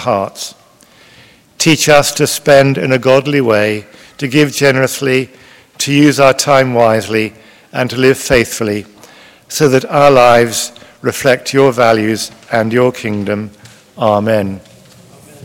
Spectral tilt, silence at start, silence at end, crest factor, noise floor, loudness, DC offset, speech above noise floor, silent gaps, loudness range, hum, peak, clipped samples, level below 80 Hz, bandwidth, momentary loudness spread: -4.5 dB/octave; 0 s; 0.85 s; 12 dB; -44 dBFS; -12 LUFS; under 0.1%; 33 dB; none; 3 LU; none; 0 dBFS; 1%; -46 dBFS; 17 kHz; 14 LU